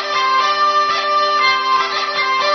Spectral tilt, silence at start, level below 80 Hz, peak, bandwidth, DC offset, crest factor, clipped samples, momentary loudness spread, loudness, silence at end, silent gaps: -0.5 dB/octave; 0 s; -62 dBFS; -2 dBFS; 6.4 kHz; under 0.1%; 12 dB; under 0.1%; 3 LU; -15 LUFS; 0 s; none